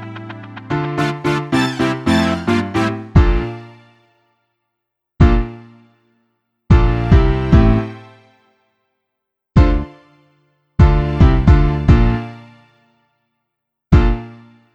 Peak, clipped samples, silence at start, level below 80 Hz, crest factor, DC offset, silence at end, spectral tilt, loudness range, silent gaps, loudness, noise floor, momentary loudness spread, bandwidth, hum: 0 dBFS; under 0.1%; 0 s; -20 dBFS; 16 dB; under 0.1%; 0.4 s; -7.5 dB/octave; 4 LU; none; -15 LUFS; -78 dBFS; 17 LU; 10.5 kHz; none